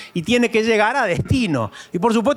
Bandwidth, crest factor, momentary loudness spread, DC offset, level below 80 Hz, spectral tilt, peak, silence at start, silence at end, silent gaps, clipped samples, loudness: 14.5 kHz; 16 dB; 6 LU; under 0.1%; -44 dBFS; -5.5 dB/octave; -4 dBFS; 0 s; 0 s; none; under 0.1%; -18 LUFS